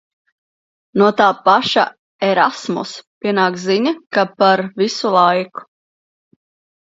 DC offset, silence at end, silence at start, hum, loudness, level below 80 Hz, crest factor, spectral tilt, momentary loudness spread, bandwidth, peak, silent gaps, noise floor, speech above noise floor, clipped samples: under 0.1%; 1.2 s; 0.95 s; none; -16 LUFS; -66 dBFS; 18 dB; -5 dB/octave; 11 LU; 7.8 kHz; 0 dBFS; 1.99-2.19 s, 3.07-3.21 s; under -90 dBFS; over 75 dB; under 0.1%